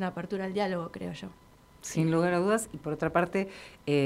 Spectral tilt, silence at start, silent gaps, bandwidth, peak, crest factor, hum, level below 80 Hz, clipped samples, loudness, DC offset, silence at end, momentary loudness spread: -6 dB/octave; 0 s; none; 15.5 kHz; -10 dBFS; 20 dB; none; -60 dBFS; under 0.1%; -30 LUFS; under 0.1%; 0 s; 14 LU